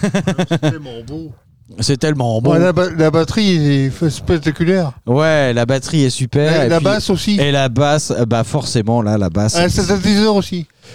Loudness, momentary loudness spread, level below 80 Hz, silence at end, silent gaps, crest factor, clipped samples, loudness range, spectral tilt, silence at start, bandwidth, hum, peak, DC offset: -15 LUFS; 6 LU; -38 dBFS; 0 s; none; 12 dB; under 0.1%; 1 LU; -5.5 dB/octave; 0 s; 15 kHz; none; -2 dBFS; 1%